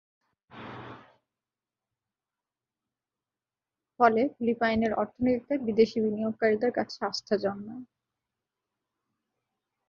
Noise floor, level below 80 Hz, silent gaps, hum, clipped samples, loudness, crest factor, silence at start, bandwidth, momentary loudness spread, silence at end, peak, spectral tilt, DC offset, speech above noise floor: under -90 dBFS; -62 dBFS; none; none; under 0.1%; -27 LUFS; 24 dB; 0.55 s; 7.2 kHz; 19 LU; 2.05 s; -8 dBFS; -6 dB/octave; under 0.1%; over 63 dB